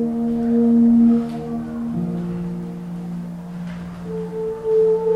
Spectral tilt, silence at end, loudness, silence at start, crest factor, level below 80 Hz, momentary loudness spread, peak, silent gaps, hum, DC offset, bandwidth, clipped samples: -10 dB/octave; 0 s; -20 LUFS; 0 s; 12 dB; -48 dBFS; 16 LU; -8 dBFS; none; none; under 0.1%; 5.2 kHz; under 0.1%